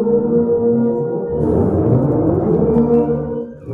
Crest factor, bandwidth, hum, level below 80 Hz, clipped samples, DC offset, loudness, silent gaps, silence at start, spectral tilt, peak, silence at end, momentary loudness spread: 12 dB; 2.8 kHz; none; -38 dBFS; under 0.1%; under 0.1%; -16 LUFS; none; 0 s; -13 dB/octave; -4 dBFS; 0 s; 6 LU